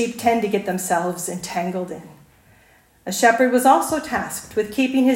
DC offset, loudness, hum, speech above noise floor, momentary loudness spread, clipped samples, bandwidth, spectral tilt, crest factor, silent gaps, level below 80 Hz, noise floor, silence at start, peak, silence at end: under 0.1%; -20 LUFS; none; 35 dB; 12 LU; under 0.1%; 16.5 kHz; -4 dB/octave; 20 dB; none; -58 dBFS; -54 dBFS; 0 s; -2 dBFS; 0 s